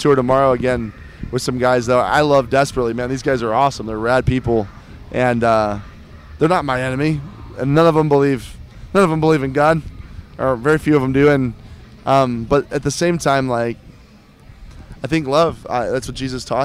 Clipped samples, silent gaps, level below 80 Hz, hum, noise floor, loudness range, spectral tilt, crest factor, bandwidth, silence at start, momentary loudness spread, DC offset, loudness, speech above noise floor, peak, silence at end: under 0.1%; none; -38 dBFS; none; -45 dBFS; 3 LU; -6 dB/octave; 14 dB; 15.5 kHz; 0 s; 12 LU; under 0.1%; -17 LUFS; 29 dB; -4 dBFS; 0 s